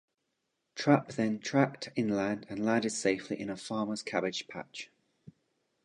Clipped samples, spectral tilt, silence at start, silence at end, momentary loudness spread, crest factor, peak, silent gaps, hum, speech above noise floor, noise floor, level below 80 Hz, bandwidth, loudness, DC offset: under 0.1%; -5 dB/octave; 0.75 s; 0.55 s; 15 LU; 24 dB; -10 dBFS; none; none; 51 dB; -82 dBFS; -72 dBFS; 11 kHz; -32 LUFS; under 0.1%